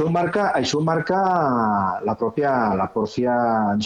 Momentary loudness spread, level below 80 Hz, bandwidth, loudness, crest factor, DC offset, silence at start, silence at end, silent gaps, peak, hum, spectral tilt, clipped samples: 4 LU; -54 dBFS; 9.4 kHz; -21 LUFS; 14 dB; under 0.1%; 0 s; 0 s; none; -8 dBFS; none; -6 dB/octave; under 0.1%